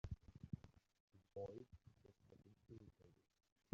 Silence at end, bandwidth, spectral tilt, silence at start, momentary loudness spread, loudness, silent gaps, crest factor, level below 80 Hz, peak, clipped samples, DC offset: 0.6 s; 7.2 kHz; -9 dB/octave; 0.05 s; 12 LU; -58 LUFS; 1.00-1.08 s; 28 dB; -68 dBFS; -30 dBFS; under 0.1%; under 0.1%